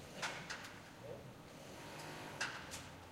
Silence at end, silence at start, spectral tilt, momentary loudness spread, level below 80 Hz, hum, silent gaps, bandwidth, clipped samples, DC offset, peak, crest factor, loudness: 0 s; 0 s; -3 dB/octave; 10 LU; -70 dBFS; none; none; 16 kHz; under 0.1%; under 0.1%; -28 dBFS; 22 dB; -48 LUFS